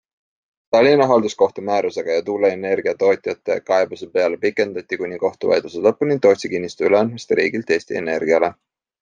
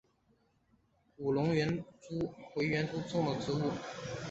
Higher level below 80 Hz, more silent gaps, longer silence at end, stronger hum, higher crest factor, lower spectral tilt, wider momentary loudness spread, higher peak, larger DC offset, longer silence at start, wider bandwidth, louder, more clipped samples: about the same, -66 dBFS vs -64 dBFS; neither; first, 0.5 s vs 0 s; neither; about the same, 16 dB vs 18 dB; about the same, -5.5 dB/octave vs -5.5 dB/octave; second, 7 LU vs 10 LU; first, -2 dBFS vs -18 dBFS; neither; second, 0.7 s vs 1.2 s; about the same, 8.8 kHz vs 8 kHz; first, -19 LUFS vs -35 LUFS; neither